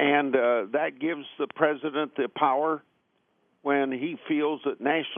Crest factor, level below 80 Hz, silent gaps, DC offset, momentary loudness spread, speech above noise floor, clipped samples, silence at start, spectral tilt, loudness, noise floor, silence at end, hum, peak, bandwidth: 20 dB; -84 dBFS; none; under 0.1%; 9 LU; 44 dB; under 0.1%; 0 s; -2.5 dB/octave; -27 LUFS; -71 dBFS; 0 s; none; -8 dBFS; 3.7 kHz